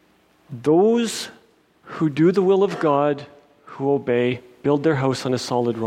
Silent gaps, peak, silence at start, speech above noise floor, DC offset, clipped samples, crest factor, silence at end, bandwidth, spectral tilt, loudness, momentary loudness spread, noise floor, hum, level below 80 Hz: none; -6 dBFS; 0.5 s; 38 dB; under 0.1%; under 0.1%; 14 dB; 0 s; 14 kHz; -6 dB/octave; -20 LUFS; 11 LU; -57 dBFS; none; -64 dBFS